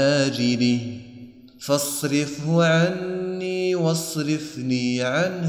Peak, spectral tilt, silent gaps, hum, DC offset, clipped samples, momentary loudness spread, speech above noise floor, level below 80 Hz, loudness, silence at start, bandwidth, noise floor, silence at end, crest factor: -6 dBFS; -5 dB/octave; none; none; under 0.1%; under 0.1%; 8 LU; 22 dB; -62 dBFS; -22 LUFS; 0 s; 18.5 kHz; -43 dBFS; 0 s; 16 dB